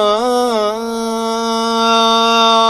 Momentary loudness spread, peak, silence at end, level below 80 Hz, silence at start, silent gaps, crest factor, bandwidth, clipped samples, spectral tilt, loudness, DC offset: 8 LU; 0 dBFS; 0 s; -52 dBFS; 0 s; none; 14 dB; 15 kHz; under 0.1%; -2.5 dB/octave; -14 LUFS; under 0.1%